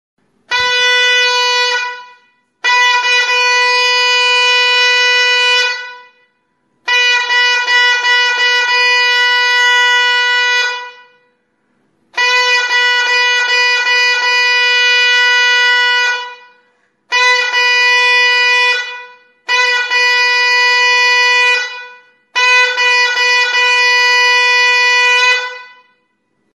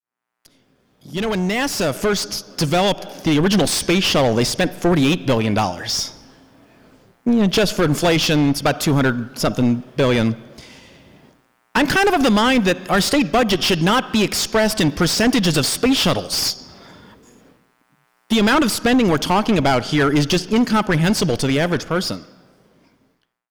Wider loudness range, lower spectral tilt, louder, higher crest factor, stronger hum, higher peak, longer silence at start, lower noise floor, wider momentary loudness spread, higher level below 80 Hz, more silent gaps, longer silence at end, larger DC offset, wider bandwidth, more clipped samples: about the same, 3 LU vs 4 LU; second, 4 dB/octave vs -4.5 dB/octave; first, -9 LUFS vs -18 LUFS; about the same, 12 dB vs 8 dB; neither; first, 0 dBFS vs -12 dBFS; second, 0.5 s vs 1.05 s; about the same, -63 dBFS vs -64 dBFS; about the same, 7 LU vs 7 LU; second, -68 dBFS vs -40 dBFS; neither; second, 0.85 s vs 1.25 s; neither; second, 11.5 kHz vs over 20 kHz; neither